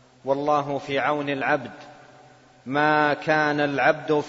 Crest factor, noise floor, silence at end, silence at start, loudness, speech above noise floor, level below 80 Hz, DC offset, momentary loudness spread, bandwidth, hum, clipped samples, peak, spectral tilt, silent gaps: 18 dB; -52 dBFS; 0 s; 0.25 s; -23 LUFS; 29 dB; -66 dBFS; under 0.1%; 7 LU; 7.8 kHz; none; under 0.1%; -4 dBFS; -6 dB/octave; none